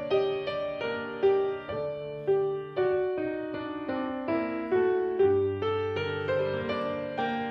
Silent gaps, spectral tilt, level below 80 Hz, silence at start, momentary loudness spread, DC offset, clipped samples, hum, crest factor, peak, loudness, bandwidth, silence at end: none; -8 dB/octave; -64 dBFS; 0 s; 8 LU; under 0.1%; under 0.1%; none; 14 dB; -14 dBFS; -29 LUFS; 5.8 kHz; 0 s